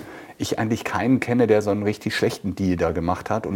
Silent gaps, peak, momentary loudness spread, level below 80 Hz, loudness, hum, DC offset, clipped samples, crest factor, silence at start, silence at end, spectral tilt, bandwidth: none; -6 dBFS; 7 LU; -48 dBFS; -22 LUFS; none; under 0.1%; under 0.1%; 16 dB; 0 s; 0 s; -6 dB/octave; 17 kHz